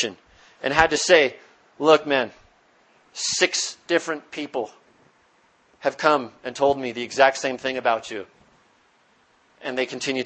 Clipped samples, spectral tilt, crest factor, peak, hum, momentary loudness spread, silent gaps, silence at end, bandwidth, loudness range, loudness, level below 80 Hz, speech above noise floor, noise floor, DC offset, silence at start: under 0.1%; -2.5 dB/octave; 24 dB; 0 dBFS; none; 14 LU; none; 0 s; 8.8 kHz; 5 LU; -22 LUFS; -56 dBFS; 39 dB; -61 dBFS; under 0.1%; 0 s